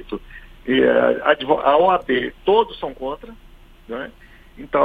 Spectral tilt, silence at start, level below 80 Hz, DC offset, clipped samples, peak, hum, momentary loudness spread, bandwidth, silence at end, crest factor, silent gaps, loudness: -7 dB/octave; 0 s; -46 dBFS; under 0.1%; under 0.1%; -2 dBFS; none; 18 LU; 4.9 kHz; 0 s; 18 dB; none; -18 LUFS